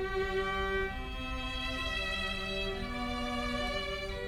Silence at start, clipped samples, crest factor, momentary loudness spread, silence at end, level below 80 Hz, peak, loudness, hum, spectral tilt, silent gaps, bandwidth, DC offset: 0 s; under 0.1%; 14 dB; 4 LU; 0 s; -42 dBFS; -22 dBFS; -35 LUFS; none; -4.5 dB/octave; none; 16 kHz; under 0.1%